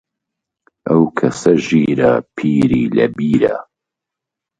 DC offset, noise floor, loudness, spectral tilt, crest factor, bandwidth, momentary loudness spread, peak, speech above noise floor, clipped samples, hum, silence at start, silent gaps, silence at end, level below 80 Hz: under 0.1%; -83 dBFS; -15 LUFS; -7 dB/octave; 16 dB; 9.2 kHz; 4 LU; 0 dBFS; 69 dB; under 0.1%; none; 0.85 s; none; 0.95 s; -48 dBFS